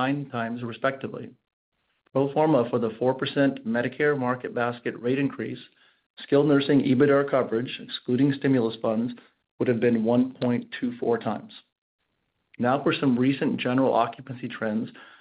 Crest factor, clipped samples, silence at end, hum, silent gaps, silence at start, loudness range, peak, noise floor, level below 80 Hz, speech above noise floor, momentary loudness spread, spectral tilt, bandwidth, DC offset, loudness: 18 dB; under 0.1%; 0.15 s; none; 1.53-1.72 s, 6.06-6.14 s, 9.51-9.58 s, 11.78-11.99 s; 0 s; 4 LU; -8 dBFS; -76 dBFS; -70 dBFS; 51 dB; 12 LU; -5.5 dB/octave; 5 kHz; under 0.1%; -25 LUFS